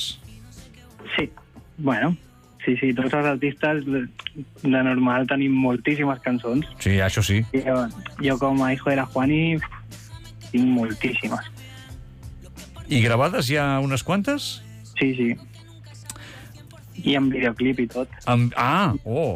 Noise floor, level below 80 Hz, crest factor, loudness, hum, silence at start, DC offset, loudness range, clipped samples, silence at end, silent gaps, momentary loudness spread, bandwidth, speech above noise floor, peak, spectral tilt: -45 dBFS; -48 dBFS; 14 dB; -23 LUFS; none; 0 s; under 0.1%; 4 LU; under 0.1%; 0 s; none; 20 LU; 15.5 kHz; 23 dB; -10 dBFS; -6 dB/octave